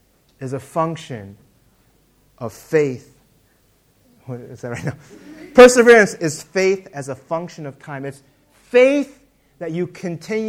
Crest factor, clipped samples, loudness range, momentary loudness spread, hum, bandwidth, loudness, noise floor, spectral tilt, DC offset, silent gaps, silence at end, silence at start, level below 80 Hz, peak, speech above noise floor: 18 dB; 0.2%; 13 LU; 24 LU; none; 14.5 kHz; -16 LUFS; -58 dBFS; -4.5 dB/octave; under 0.1%; none; 0 s; 0.4 s; -52 dBFS; 0 dBFS; 41 dB